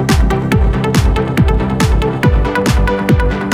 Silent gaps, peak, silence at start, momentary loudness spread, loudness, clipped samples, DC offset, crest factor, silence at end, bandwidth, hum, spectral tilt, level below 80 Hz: none; 0 dBFS; 0 s; 1 LU; -13 LUFS; under 0.1%; under 0.1%; 12 dB; 0 s; 16 kHz; none; -6.5 dB/octave; -16 dBFS